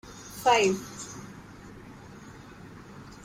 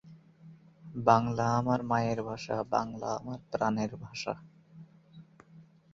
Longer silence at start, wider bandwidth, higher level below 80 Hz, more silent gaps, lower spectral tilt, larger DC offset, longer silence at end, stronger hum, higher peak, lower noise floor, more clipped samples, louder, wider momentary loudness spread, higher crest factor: about the same, 0.05 s vs 0.05 s; first, 16 kHz vs 7.6 kHz; first, -58 dBFS vs -64 dBFS; neither; second, -3.5 dB/octave vs -6.5 dB/octave; neither; second, 0.1 s vs 0.3 s; neither; second, -10 dBFS vs -6 dBFS; second, -47 dBFS vs -57 dBFS; neither; first, -26 LUFS vs -31 LUFS; first, 24 LU vs 12 LU; about the same, 22 dB vs 26 dB